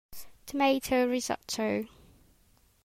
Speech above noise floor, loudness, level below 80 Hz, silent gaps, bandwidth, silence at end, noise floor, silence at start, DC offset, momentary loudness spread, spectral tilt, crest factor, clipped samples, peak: 36 dB; -29 LUFS; -60 dBFS; none; 16 kHz; 1 s; -65 dBFS; 0.1 s; under 0.1%; 19 LU; -3.5 dB/octave; 18 dB; under 0.1%; -14 dBFS